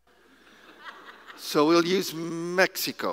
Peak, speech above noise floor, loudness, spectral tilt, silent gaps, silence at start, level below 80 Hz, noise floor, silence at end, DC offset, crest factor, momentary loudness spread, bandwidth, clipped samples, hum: -4 dBFS; 33 dB; -25 LUFS; -4 dB/octave; none; 0.8 s; -76 dBFS; -58 dBFS; 0 s; under 0.1%; 22 dB; 24 LU; 16 kHz; under 0.1%; none